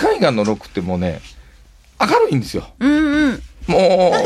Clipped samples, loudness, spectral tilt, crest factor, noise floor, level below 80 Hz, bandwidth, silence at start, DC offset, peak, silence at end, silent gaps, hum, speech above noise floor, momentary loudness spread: under 0.1%; -17 LUFS; -6 dB/octave; 16 dB; -46 dBFS; -40 dBFS; 14 kHz; 0 s; under 0.1%; -2 dBFS; 0 s; none; none; 30 dB; 11 LU